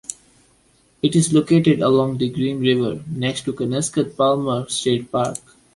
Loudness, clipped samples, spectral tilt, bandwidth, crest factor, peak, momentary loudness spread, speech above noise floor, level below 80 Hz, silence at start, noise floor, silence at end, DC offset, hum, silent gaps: -19 LUFS; under 0.1%; -5.5 dB/octave; 11.5 kHz; 16 dB; -4 dBFS; 9 LU; 39 dB; -56 dBFS; 0.1 s; -58 dBFS; 0.4 s; under 0.1%; none; none